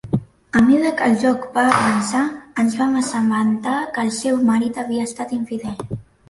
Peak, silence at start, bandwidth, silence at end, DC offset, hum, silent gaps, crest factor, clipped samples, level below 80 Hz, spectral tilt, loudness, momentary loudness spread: -2 dBFS; 0.05 s; 11.5 kHz; 0.25 s; under 0.1%; none; none; 16 dB; under 0.1%; -52 dBFS; -5 dB/octave; -19 LUFS; 10 LU